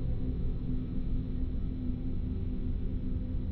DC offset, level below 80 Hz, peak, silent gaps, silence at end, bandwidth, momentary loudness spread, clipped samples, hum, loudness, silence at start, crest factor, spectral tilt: under 0.1%; -34 dBFS; -20 dBFS; none; 0 s; 4.3 kHz; 1 LU; under 0.1%; none; -36 LUFS; 0 s; 12 dB; -12 dB/octave